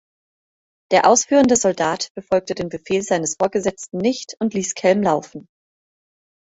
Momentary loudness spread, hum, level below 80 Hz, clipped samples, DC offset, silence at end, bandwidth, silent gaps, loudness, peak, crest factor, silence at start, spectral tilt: 10 LU; none; -58 dBFS; under 0.1%; under 0.1%; 1.1 s; 8.2 kHz; 2.10-2.15 s; -19 LUFS; -2 dBFS; 18 dB; 0.9 s; -3.5 dB/octave